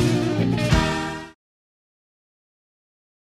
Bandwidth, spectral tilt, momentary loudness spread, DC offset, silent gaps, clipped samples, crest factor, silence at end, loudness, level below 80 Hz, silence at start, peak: 14 kHz; -6 dB/octave; 15 LU; under 0.1%; none; under 0.1%; 20 dB; 2 s; -22 LUFS; -36 dBFS; 0 s; -6 dBFS